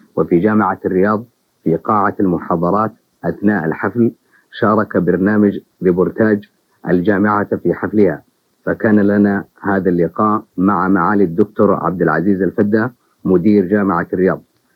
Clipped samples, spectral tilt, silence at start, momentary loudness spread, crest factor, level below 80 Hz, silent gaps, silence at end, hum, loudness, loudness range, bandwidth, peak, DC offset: under 0.1%; -10.5 dB/octave; 0.15 s; 7 LU; 14 dB; -56 dBFS; none; 0.35 s; none; -15 LUFS; 2 LU; 4.9 kHz; 0 dBFS; under 0.1%